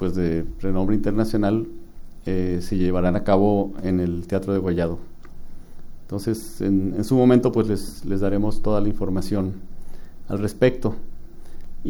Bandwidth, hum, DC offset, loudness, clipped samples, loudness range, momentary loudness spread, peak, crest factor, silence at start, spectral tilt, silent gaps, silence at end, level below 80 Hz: 12.5 kHz; none; under 0.1%; -23 LUFS; under 0.1%; 4 LU; 10 LU; -4 dBFS; 18 dB; 0 s; -8 dB/octave; none; 0 s; -32 dBFS